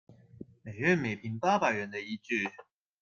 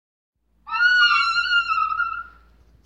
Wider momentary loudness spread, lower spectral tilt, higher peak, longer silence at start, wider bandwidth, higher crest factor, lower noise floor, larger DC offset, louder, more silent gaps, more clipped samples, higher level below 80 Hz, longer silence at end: first, 20 LU vs 12 LU; first, -6 dB/octave vs 1.5 dB/octave; second, -12 dBFS vs -6 dBFS; second, 0.1 s vs 0.65 s; second, 7.2 kHz vs 8.6 kHz; about the same, 20 dB vs 16 dB; about the same, -51 dBFS vs -53 dBFS; neither; second, -31 LUFS vs -19 LUFS; neither; neither; second, -70 dBFS vs -56 dBFS; second, 0.4 s vs 0.6 s